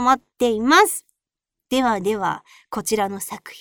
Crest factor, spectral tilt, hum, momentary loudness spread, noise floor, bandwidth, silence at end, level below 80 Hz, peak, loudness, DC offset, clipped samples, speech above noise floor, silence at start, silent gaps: 20 dB; -3 dB/octave; none; 16 LU; -85 dBFS; over 20 kHz; 0 s; -56 dBFS; -2 dBFS; -20 LUFS; under 0.1%; under 0.1%; 65 dB; 0 s; none